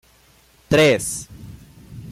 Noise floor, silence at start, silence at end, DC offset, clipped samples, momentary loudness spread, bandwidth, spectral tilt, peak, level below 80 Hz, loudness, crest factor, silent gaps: -54 dBFS; 0.7 s; 0 s; under 0.1%; under 0.1%; 25 LU; 16 kHz; -4 dB/octave; -6 dBFS; -48 dBFS; -18 LUFS; 16 dB; none